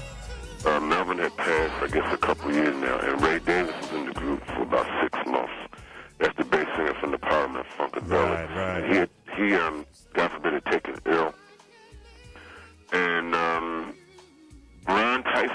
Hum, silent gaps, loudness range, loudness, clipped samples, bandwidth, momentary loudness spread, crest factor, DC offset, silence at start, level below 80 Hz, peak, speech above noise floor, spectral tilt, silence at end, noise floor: none; none; 4 LU; -26 LUFS; under 0.1%; 11 kHz; 11 LU; 18 dB; under 0.1%; 0 s; -48 dBFS; -10 dBFS; 27 dB; -5 dB/octave; 0 s; -53 dBFS